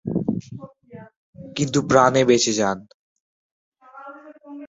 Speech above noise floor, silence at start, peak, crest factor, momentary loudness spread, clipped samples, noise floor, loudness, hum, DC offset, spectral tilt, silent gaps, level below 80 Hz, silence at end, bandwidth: 23 dB; 0.05 s; -2 dBFS; 22 dB; 25 LU; under 0.1%; -42 dBFS; -19 LUFS; none; under 0.1%; -4.5 dB/octave; 1.17-1.33 s, 2.94-3.72 s; -56 dBFS; 0 s; 8 kHz